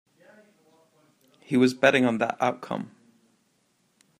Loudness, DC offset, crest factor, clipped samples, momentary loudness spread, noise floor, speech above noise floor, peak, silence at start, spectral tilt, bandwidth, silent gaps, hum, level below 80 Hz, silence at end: -24 LUFS; under 0.1%; 24 dB; under 0.1%; 15 LU; -69 dBFS; 46 dB; -4 dBFS; 1.5 s; -5.5 dB/octave; 14 kHz; none; none; -74 dBFS; 1.3 s